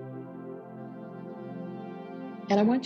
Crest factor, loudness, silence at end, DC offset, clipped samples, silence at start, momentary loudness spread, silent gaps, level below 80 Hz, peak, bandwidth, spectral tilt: 20 dB; -34 LUFS; 0 s; under 0.1%; under 0.1%; 0 s; 16 LU; none; -78 dBFS; -12 dBFS; 6.6 kHz; -7.5 dB/octave